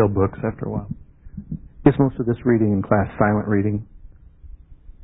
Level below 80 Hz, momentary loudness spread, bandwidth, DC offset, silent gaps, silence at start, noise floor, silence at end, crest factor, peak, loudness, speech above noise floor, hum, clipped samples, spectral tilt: -40 dBFS; 17 LU; 4 kHz; under 0.1%; none; 0 s; -43 dBFS; 0.15 s; 20 dB; 0 dBFS; -21 LUFS; 24 dB; none; under 0.1%; -13.5 dB/octave